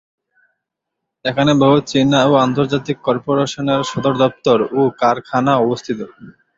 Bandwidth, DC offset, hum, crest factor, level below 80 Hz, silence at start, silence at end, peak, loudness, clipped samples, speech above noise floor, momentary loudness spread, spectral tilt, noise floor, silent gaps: 7.8 kHz; under 0.1%; none; 16 dB; -54 dBFS; 1.25 s; 0.25 s; 0 dBFS; -16 LUFS; under 0.1%; 63 dB; 9 LU; -6 dB/octave; -79 dBFS; none